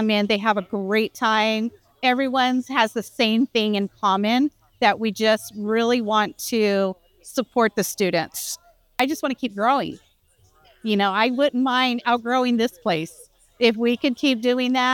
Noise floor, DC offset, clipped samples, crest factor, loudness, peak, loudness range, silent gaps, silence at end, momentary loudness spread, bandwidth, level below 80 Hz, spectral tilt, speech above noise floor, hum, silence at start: -60 dBFS; under 0.1%; under 0.1%; 20 dB; -21 LUFS; -2 dBFS; 3 LU; none; 0 s; 7 LU; 19 kHz; -64 dBFS; -4 dB/octave; 39 dB; none; 0 s